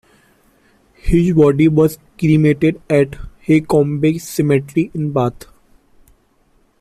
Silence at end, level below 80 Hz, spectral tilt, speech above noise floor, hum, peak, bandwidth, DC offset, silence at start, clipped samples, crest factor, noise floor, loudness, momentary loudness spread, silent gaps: 1.5 s; -36 dBFS; -7.5 dB/octave; 42 dB; none; -2 dBFS; 15 kHz; under 0.1%; 1.05 s; under 0.1%; 14 dB; -57 dBFS; -15 LUFS; 8 LU; none